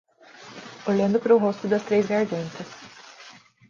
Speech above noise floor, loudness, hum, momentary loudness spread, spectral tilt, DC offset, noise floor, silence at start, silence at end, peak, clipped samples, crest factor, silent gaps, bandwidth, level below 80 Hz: 27 dB; -23 LUFS; none; 24 LU; -6.5 dB/octave; under 0.1%; -49 dBFS; 0.4 s; 0.4 s; -6 dBFS; under 0.1%; 18 dB; none; 7.4 kHz; -68 dBFS